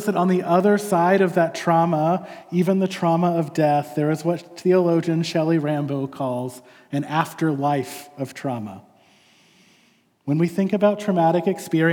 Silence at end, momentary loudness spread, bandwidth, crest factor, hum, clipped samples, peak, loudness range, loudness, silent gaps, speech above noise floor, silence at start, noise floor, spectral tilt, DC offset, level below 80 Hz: 0 s; 11 LU; 18 kHz; 16 dB; none; under 0.1%; -4 dBFS; 7 LU; -21 LUFS; none; 39 dB; 0 s; -60 dBFS; -7 dB/octave; under 0.1%; -78 dBFS